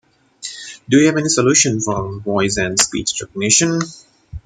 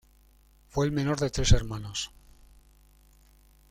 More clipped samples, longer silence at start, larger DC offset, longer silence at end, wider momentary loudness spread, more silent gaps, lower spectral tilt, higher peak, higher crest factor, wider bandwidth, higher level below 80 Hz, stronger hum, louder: neither; second, 0.4 s vs 0.75 s; neither; second, 0.05 s vs 1.65 s; first, 16 LU vs 10 LU; neither; second, -3 dB/octave vs -5 dB/octave; first, 0 dBFS vs -6 dBFS; about the same, 18 dB vs 22 dB; about the same, 15 kHz vs 14 kHz; second, -46 dBFS vs -36 dBFS; neither; first, -15 LUFS vs -29 LUFS